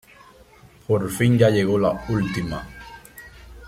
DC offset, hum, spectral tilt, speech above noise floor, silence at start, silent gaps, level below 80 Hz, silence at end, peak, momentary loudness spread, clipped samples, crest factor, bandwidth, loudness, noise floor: under 0.1%; none; -6.5 dB/octave; 30 dB; 0.9 s; none; -46 dBFS; 0 s; -4 dBFS; 24 LU; under 0.1%; 20 dB; 15.5 kHz; -21 LUFS; -50 dBFS